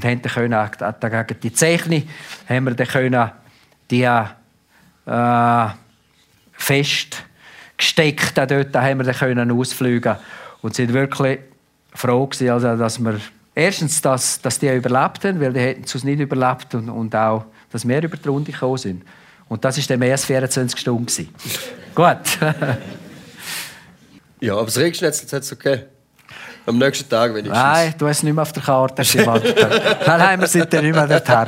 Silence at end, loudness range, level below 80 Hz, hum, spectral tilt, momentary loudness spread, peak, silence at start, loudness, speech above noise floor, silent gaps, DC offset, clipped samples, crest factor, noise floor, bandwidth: 0 s; 6 LU; -60 dBFS; none; -4.5 dB/octave; 12 LU; 0 dBFS; 0 s; -18 LUFS; 39 dB; none; under 0.1%; under 0.1%; 18 dB; -56 dBFS; 16 kHz